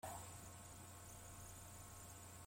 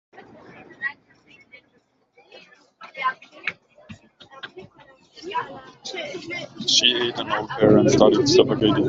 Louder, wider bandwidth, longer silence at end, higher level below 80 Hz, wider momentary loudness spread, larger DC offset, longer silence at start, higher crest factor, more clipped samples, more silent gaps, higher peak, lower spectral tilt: second, -56 LUFS vs -20 LUFS; first, 16.5 kHz vs 8 kHz; about the same, 0 s vs 0 s; second, -68 dBFS vs -54 dBFS; second, 3 LU vs 23 LU; neither; second, 0.05 s vs 0.2 s; about the same, 18 dB vs 22 dB; neither; neither; second, -38 dBFS vs -2 dBFS; about the same, -3.5 dB/octave vs -4 dB/octave